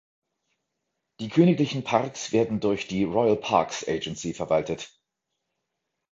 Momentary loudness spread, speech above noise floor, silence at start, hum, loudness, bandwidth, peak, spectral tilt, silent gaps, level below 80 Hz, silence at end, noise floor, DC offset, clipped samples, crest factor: 11 LU; 57 dB; 1.2 s; none; -25 LUFS; 7.8 kHz; -6 dBFS; -5.5 dB/octave; none; -58 dBFS; 1.25 s; -82 dBFS; under 0.1%; under 0.1%; 22 dB